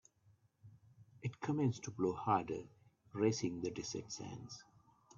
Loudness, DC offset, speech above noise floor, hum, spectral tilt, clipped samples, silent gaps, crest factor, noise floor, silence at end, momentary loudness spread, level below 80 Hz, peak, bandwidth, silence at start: -40 LUFS; under 0.1%; 33 dB; none; -6 dB/octave; under 0.1%; none; 22 dB; -72 dBFS; 0.55 s; 15 LU; -74 dBFS; -20 dBFS; 7.6 kHz; 0.65 s